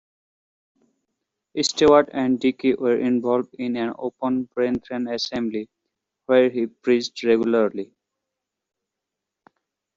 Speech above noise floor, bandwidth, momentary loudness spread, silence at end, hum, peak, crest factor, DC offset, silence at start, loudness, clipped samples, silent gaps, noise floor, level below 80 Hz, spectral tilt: 63 dB; 8 kHz; 11 LU; 2.1 s; none; -2 dBFS; 20 dB; under 0.1%; 1.55 s; -22 LUFS; under 0.1%; none; -84 dBFS; -60 dBFS; -3.5 dB/octave